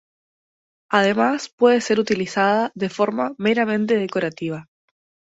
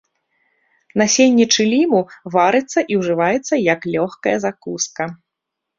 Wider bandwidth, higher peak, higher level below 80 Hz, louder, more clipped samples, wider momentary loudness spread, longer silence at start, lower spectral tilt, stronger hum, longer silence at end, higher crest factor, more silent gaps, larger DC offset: about the same, 8 kHz vs 7.6 kHz; about the same, -2 dBFS vs -2 dBFS; second, -66 dBFS vs -60 dBFS; second, -20 LUFS vs -17 LUFS; neither; second, 8 LU vs 11 LU; about the same, 0.9 s vs 0.95 s; first, -5 dB/octave vs -3.5 dB/octave; neither; about the same, 0.75 s vs 0.65 s; about the same, 18 dB vs 16 dB; first, 1.53-1.58 s vs none; neither